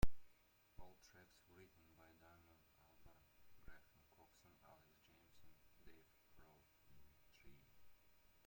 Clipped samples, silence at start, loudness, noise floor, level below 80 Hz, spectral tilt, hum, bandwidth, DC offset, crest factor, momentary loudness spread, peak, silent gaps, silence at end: under 0.1%; 0 s; -63 LUFS; -74 dBFS; -60 dBFS; -5.5 dB/octave; none; 16.5 kHz; under 0.1%; 26 dB; 3 LU; -22 dBFS; none; 0.55 s